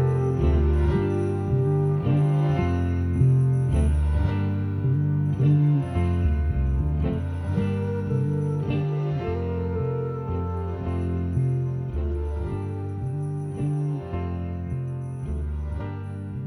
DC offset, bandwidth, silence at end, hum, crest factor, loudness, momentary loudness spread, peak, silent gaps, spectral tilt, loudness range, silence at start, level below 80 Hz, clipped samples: under 0.1%; 10.5 kHz; 0 s; none; 14 dB; -25 LUFS; 9 LU; -10 dBFS; none; -10 dB/octave; 7 LU; 0 s; -32 dBFS; under 0.1%